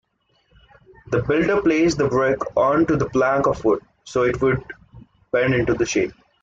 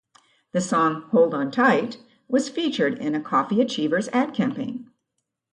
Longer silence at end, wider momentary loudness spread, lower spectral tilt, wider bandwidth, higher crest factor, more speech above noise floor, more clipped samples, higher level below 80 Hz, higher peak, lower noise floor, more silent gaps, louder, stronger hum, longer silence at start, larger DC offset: second, 0.3 s vs 0.7 s; second, 7 LU vs 10 LU; about the same, -6 dB/octave vs -5 dB/octave; second, 7.8 kHz vs 11 kHz; about the same, 14 dB vs 18 dB; second, 45 dB vs 57 dB; neither; first, -46 dBFS vs -70 dBFS; about the same, -6 dBFS vs -6 dBFS; second, -64 dBFS vs -79 dBFS; neither; first, -20 LUFS vs -23 LUFS; neither; first, 1.1 s vs 0.55 s; neither